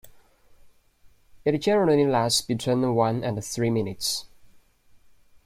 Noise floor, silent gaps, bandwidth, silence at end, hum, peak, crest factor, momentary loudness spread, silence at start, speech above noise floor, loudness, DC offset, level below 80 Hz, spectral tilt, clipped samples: -56 dBFS; none; 16 kHz; 1.2 s; none; -8 dBFS; 18 dB; 8 LU; 0.05 s; 33 dB; -24 LUFS; under 0.1%; -58 dBFS; -5 dB/octave; under 0.1%